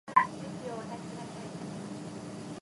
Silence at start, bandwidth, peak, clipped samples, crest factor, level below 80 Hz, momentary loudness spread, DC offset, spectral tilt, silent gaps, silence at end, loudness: 0.05 s; 11.5 kHz; -10 dBFS; under 0.1%; 26 dB; -68 dBFS; 14 LU; under 0.1%; -5.5 dB/octave; none; 0 s; -36 LUFS